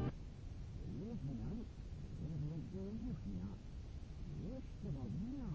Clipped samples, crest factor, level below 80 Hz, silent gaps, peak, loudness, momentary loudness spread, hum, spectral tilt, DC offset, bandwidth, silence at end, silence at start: under 0.1%; 16 dB; -52 dBFS; none; -28 dBFS; -48 LUFS; 7 LU; none; -8.5 dB/octave; under 0.1%; 8 kHz; 0 s; 0 s